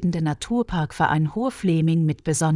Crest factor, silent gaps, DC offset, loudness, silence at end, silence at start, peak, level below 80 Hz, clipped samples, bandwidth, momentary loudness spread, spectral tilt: 14 dB; none; under 0.1%; -23 LUFS; 0 s; 0 s; -6 dBFS; -46 dBFS; under 0.1%; 11.5 kHz; 5 LU; -6 dB/octave